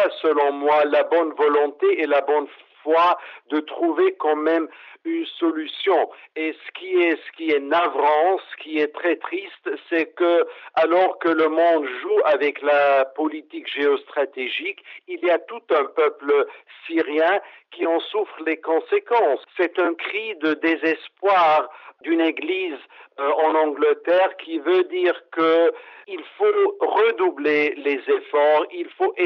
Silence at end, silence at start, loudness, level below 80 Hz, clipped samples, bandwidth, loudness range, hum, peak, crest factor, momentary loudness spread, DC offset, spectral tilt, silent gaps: 0 s; 0 s; -21 LUFS; -84 dBFS; under 0.1%; 6 kHz; 3 LU; none; -8 dBFS; 14 dB; 10 LU; under 0.1%; -5.5 dB/octave; none